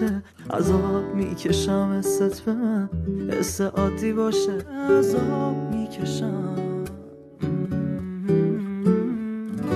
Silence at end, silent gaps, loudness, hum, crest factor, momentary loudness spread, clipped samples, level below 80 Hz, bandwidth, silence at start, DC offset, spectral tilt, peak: 0 s; none; -24 LUFS; none; 16 dB; 8 LU; under 0.1%; -44 dBFS; 13 kHz; 0 s; under 0.1%; -6.5 dB/octave; -8 dBFS